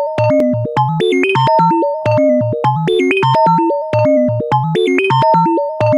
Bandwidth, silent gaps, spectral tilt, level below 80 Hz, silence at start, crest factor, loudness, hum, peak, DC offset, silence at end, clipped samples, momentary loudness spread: 11 kHz; none; -7.5 dB/octave; -52 dBFS; 0 s; 10 dB; -13 LUFS; none; -2 dBFS; under 0.1%; 0 s; under 0.1%; 4 LU